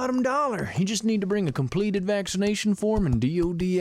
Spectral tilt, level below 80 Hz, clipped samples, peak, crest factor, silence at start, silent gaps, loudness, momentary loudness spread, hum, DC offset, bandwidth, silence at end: -5.5 dB/octave; -42 dBFS; under 0.1%; -12 dBFS; 12 dB; 0 s; none; -25 LUFS; 2 LU; none; under 0.1%; 14.5 kHz; 0 s